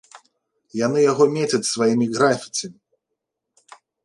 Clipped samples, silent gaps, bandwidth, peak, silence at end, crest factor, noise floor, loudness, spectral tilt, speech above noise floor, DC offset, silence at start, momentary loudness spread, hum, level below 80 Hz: under 0.1%; none; 11.5 kHz; -4 dBFS; 1.3 s; 18 dB; -80 dBFS; -20 LUFS; -4.5 dB/octave; 61 dB; under 0.1%; 0.15 s; 11 LU; none; -70 dBFS